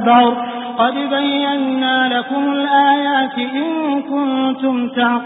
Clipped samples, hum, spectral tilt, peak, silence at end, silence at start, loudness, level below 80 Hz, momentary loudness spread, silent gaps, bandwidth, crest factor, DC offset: under 0.1%; none; -9.5 dB/octave; 0 dBFS; 0 s; 0 s; -16 LUFS; -68 dBFS; 7 LU; none; 4 kHz; 14 dB; under 0.1%